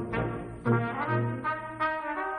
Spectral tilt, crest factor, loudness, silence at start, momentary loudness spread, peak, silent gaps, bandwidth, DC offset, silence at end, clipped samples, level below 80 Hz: -8.5 dB/octave; 16 dB; -30 LUFS; 0 s; 5 LU; -14 dBFS; none; 9.4 kHz; under 0.1%; 0 s; under 0.1%; -52 dBFS